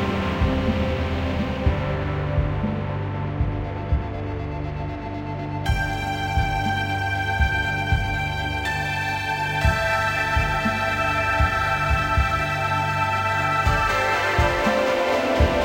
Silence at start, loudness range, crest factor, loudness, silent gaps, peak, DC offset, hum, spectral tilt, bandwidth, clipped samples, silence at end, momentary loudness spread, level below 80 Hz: 0 s; 6 LU; 16 dB; -23 LUFS; none; -6 dBFS; under 0.1%; none; -5.5 dB/octave; 16 kHz; under 0.1%; 0 s; 7 LU; -30 dBFS